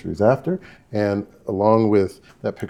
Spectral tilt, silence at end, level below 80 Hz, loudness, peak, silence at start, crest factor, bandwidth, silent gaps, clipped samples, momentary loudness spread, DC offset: -8.5 dB/octave; 0 s; -58 dBFS; -21 LUFS; -2 dBFS; 0.05 s; 20 dB; 13 kHz; none; under 0.1%; 13 LU; 0.1%